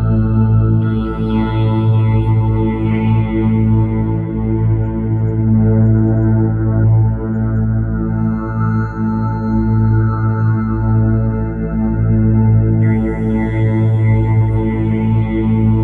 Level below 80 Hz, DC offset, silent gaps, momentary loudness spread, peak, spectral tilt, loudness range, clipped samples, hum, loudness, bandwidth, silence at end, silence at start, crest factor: -24 dBFS; under 0.1%; none; 5 LU; -2 dBFS; -11.5 dB/octave; 2 LU; under 0.1%; none; -15 LUFS; 3.6 kHz; 0 s; 0 s; 10 dB